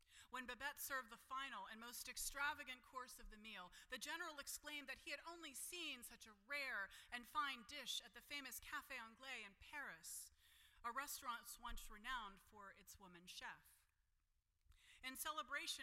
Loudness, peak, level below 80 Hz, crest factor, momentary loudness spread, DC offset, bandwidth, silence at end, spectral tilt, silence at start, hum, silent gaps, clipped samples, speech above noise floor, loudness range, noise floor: -51 LUFS; -34 dBFS; -70 dBFS; 20 dB; 12 LU; under 0.1%; 16 kHz; 0 s; -0.5 dB/octave; 0 s; none; none; under 0.1%; 33 dB; 6 LU; -85 dBFS